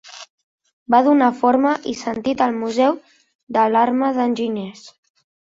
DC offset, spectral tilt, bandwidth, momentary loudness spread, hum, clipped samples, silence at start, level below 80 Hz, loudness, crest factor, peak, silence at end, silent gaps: under 0.1%; -5.5 dB/octave; 7.8 kHz; 13 LU; none; under 0.1%; 0.05 s; -64 dBFS; -18 LUFS; 18 dB; -2 dBFS; 0.55 s; 0.30-0.58 s, 0.73-0.86 s, 3.35-3.47 s